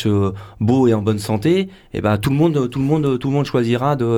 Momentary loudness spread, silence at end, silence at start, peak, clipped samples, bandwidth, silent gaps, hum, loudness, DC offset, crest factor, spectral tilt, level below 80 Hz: 5 LU; 0 s; 0 s; -4 dBFS; under 0.1%; 18 kHz; none; none; -18 LUFS; under 0.1%; 12 dB; -7.5 dB/octave; -46 dBFS